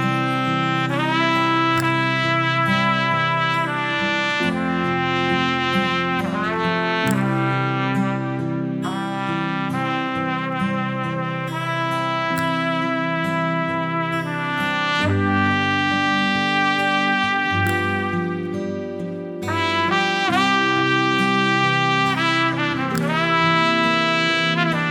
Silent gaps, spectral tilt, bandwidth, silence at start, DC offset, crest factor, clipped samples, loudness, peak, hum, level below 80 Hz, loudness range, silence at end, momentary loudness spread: none; -5.5 dB/octave; 18 kHz; 0 s; under 0.1%; 16 dB; under 0.1%; -20 LUFS; -4 dBFS; none; -58 dBFS; 5 LU; 0 s; 7 LU